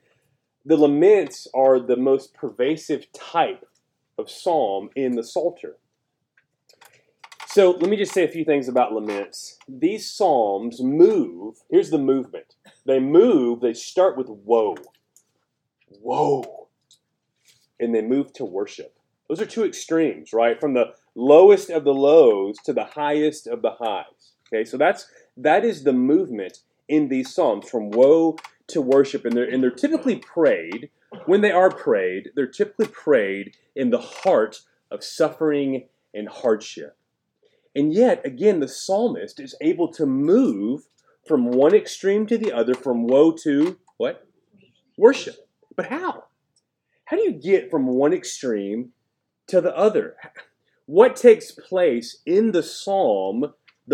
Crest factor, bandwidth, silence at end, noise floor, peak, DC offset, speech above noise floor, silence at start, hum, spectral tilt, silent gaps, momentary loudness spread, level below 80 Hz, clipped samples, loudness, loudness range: 20 dB; 13 kHz; 0 s; -76 dBFS; 0 dBFS; under 0.1%; 57 dB; 0.65 s; none; -5.5 dB/octave; none; 16 LU; -82 dBFS; under 0.1%; -20 LUFS; 7 LU